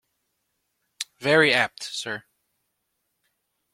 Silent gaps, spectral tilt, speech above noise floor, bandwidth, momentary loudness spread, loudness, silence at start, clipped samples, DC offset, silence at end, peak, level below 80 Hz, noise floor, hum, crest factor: none; -3.5 dB/octave; 54 dB; 16 kHz; 18 LU; -22 LUFS; 1 s; under 0.1%; under 0.1%; 1.55 s; -4 dBFS; -68 dBFS; -77 dBFS; none; 24 dB